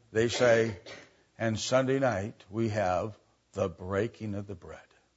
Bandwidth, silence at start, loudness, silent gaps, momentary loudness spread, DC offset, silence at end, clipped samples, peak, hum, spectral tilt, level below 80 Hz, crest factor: 8 kHz; 0.1 s; -30 LUFS; none; 19 LU; under 0.1%; 0.35 s; under 0.1%; -12 dBFS; none; -5 dB/octave; -64 dBFS; 20 dB